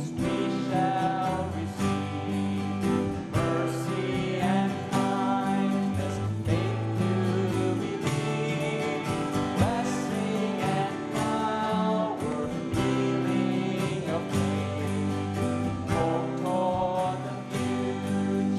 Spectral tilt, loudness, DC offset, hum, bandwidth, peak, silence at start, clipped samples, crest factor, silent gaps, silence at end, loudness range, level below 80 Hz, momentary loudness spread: -6.5 dB/octave; -28 LUFS; under 0.1%; none; 13.5 kHz; -12 dBFS; 0 s; under 0.1%; 16 dB; none; 0 s; 1 LU; -52 dBFS; 4 LU